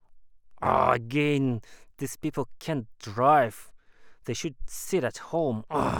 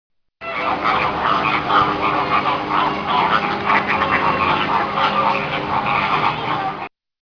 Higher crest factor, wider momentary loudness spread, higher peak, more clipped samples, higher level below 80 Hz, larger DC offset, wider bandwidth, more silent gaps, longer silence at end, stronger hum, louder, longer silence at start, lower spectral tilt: about the same, 20 dB vs 18 dB; first, 15 LU vs 6 LU; second, -8 dBFS vs 0 dBFS; neither; second, -52 dBFS vs -46 dBFS; neither; first, over 20 kHz vs 5.4 kHz; neither; second, 0 s vs 0.35 s; neither; second, -28 LUFS vs -18 LUFS; second, 0.1 s vs 0.4 s; about the same, -5.5 dB/octave vs -5.5 dB/octave